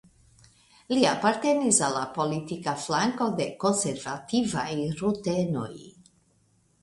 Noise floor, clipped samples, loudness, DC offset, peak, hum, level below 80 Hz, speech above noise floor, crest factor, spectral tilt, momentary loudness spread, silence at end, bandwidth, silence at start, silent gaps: -66 dBFS; under 0.1%; -26 LUFS; under 0.1%; -6 dBFS; none; -62 dBFS; 39 dB; 22 dB; -4 dB/octave; 9 LU; 0.95 s; 11.5 kHz; 0.9 s; none